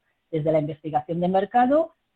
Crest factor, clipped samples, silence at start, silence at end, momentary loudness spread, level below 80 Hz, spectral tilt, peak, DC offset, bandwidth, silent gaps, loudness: 14 dB; under 0.1%; 0.3 s; 0.25 s; 8 LU; -60 dBFS; -9.5 dB/octave; -8 dBFS; under 0.1%; 7.6 kHz; none; -23 LUFS